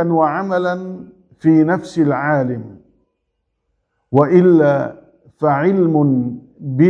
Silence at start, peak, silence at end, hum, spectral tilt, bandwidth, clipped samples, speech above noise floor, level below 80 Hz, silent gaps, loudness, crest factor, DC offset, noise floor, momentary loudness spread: 0 s; 0 dBFS; 0 s; none; -9.5 dB/octave; 7.8 kHz; under 0.1%; 57 dB; -60 dBFS; none; -15 LUFS; 16 dB; under 0.1%; -72 dBFS; 15 LU